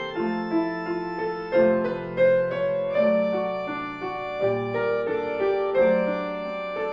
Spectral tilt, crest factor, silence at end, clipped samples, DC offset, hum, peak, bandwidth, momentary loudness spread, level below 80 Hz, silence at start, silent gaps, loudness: -8 dB/octave; 16 dB; 0 s; under 0.1%; under 0.1%; none; -8 dBFS; 5.6 kHz; 9 LU; -56 dBFS; 0 s; none; -25 LUFS